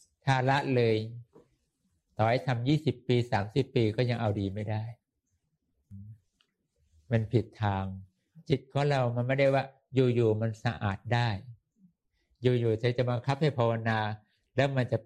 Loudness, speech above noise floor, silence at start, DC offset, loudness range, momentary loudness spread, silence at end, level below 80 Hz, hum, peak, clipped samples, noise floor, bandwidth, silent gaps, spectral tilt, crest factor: -29 LUFS; 51 dB; 0.25 s; under 0.1%; 7 LU; 10 LU; 0.05 s; -64 dBFS; none; -10 dBFS; under 0.1%; -79 dBFS; 9.2 kHz; none; -7.5 dB/octave; 20 dB